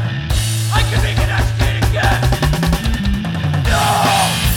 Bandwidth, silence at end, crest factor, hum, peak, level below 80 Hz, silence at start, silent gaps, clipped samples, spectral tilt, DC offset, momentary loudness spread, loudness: 18.5 kHz; 0 s; 14 dB; none; 0 dBFS; -20 dBFS; 0 s; none; under 0.1%; -4.5 dB/octave; under 0.1%; 5 LU; -16 LUFS